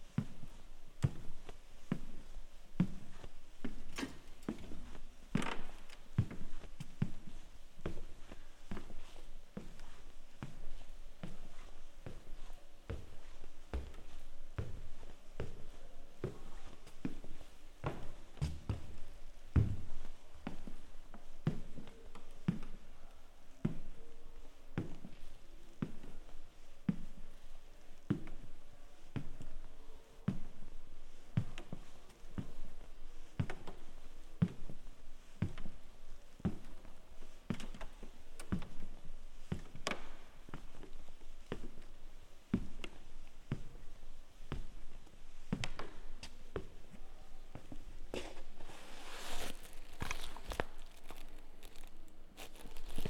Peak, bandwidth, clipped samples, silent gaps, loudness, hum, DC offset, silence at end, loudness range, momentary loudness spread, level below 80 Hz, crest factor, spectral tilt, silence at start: -16 dBFS; 11.5 kHz; under 0.1%; none; -46 LUFS; none; under 0.1%; 0 s; 8 LU; 18 LU; -48 dBFS; 24 dB; -6 dB/octave; 0 s